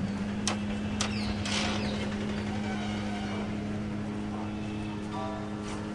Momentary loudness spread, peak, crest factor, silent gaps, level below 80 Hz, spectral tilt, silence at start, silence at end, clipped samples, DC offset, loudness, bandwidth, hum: 5 LU; -12 dBFS; 20 dB; none; -48 dBFS; -5 dB/octave; 0 s; 0 s; under 0.1%; under 0.1%; -33 LUFS; 11.5 kHz; none